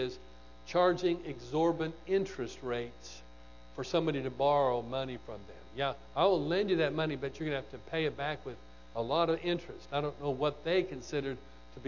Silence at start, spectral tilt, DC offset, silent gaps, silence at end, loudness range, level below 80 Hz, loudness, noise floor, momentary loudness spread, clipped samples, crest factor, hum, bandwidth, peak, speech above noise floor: 0 s; -6 dB/octave; 0.2%; none; 0 s; 3 LU; -56 dBFS; -33 LUFS; -55 dBFS; 18 LU; under 0.1%; 18 dB; none; 7.4 kHz; -14 dBFS; 22 dB